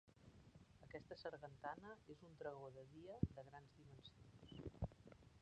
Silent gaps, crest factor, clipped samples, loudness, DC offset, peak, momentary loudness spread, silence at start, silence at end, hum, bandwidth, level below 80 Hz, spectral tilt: none; 30 dB; under 0.1%; -55 LUFS; under 0.1%; -26 dBFS; 19 LU; 0.05 s; 0 s; none; 9 kHz; -64 dBFS; -7.5 dB/octave